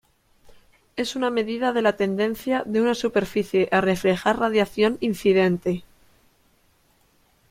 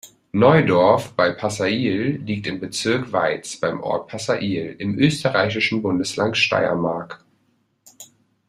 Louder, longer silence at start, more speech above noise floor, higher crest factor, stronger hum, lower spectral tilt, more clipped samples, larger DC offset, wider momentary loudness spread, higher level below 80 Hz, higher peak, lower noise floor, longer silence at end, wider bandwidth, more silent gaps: about the same, -22 LUFS vs -20 LUFS; first, 0.95 s vs 0.05 s; second, 40 dB vs 45 dB; about the same, 18 dB vs 20 dB; neither; about the same, -5.5 dB/octave vs -5 dB/octave; neither; neither; second, 6 LU vs 11 LU; about the same, -56 dBFS vs -58 dBFS; second, -6 dBFS vs -2 dBFS; about the same, -62 dBFS vs -65 dBFS; first, 1.7 s vs 0.45 s; about the same, 16.5 kHz vs 15 kHz; neither